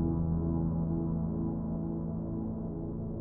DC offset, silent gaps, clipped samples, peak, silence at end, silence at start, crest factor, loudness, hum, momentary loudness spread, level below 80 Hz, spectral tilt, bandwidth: under 0.1%; none; under 0.1%; -20 dBFS; 0 s; 0 s; 14 dB; -34 LUFS; none; 6 LU; -44 dBFS; -13 dB/octave; 1.7 kHz